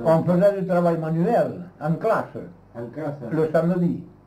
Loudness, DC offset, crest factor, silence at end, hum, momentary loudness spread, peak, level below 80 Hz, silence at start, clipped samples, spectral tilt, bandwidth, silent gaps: -22 LUFS; under 0.1%; 14 dB; 0.2 s; none; 16 LU; -8 dBFS; -60 dBFS; 0 s; under 0.1%; -9.5 dB/octave; 11.5 kHz; none